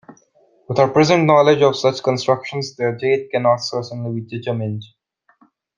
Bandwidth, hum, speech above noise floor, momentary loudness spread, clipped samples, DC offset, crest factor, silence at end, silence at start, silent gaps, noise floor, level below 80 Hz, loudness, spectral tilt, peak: 9.6 kHz; none; 40 dB; 13 LU; under 0.1%; under 0.1%; 18 dB; 0.95 s; 0.1 s; none; -57 dBFS; -60 dBFS; -18 LUFS; -6 dB/octave; 0 dBFS